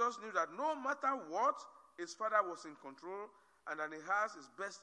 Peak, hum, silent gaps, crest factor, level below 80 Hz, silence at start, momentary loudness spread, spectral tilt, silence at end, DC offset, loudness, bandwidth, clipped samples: -20 dBFS; none; none; 20 dB; under -90 dBFS; 0 s; 15 LU; -2.5 dB/octave; 0 s; under 0.1%; -39 LUFS; 10.5 kHz; under 0.1%